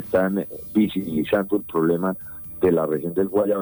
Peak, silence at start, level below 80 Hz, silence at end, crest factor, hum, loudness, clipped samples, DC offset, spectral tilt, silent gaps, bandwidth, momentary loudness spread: -8 dBFS; 0 s; -52 dBFS; 0 s; 14 dB; none; -22 LUFS; under 0.1%; under 0.1%; -8.5 dB/octave; none; over 20 kHz; 6 LU